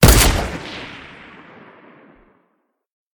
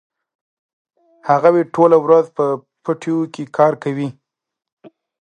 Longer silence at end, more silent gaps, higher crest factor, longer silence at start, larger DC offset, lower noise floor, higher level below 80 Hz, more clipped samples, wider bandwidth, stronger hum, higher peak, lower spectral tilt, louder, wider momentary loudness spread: first, 2.2 s vs 0.35 s; second, none vs 4.72-4.77 s; about the same, 20 dB vs 18 dB; second, 0 s vs 1.25 s; neither; second, -68 dBFS vs -83 dBFS; first, -24 dBFS vs -70 dBFS; neither; first, 18 kHz vs 9.2 kHz; neither; about the same, 0 dBFS vs 0 dBFS; second, -4 dB/octave vs -8 dB/octave; about the same, -17 LUFS vs -16 LUFS; first, 28 LU vs 12 LU